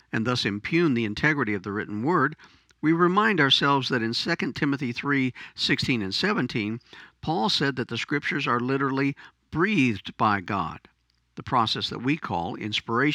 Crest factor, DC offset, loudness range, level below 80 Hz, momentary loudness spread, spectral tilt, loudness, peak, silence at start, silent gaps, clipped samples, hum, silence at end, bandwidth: 20 dB; under 0.1%; 3 LU; -58 dBFS; 9 LU; -5.5 dB/octave; -25 LUFS; -6 dBFS; 0.15 s; none; under 0.1%; none; 0 s; 11.5 kHz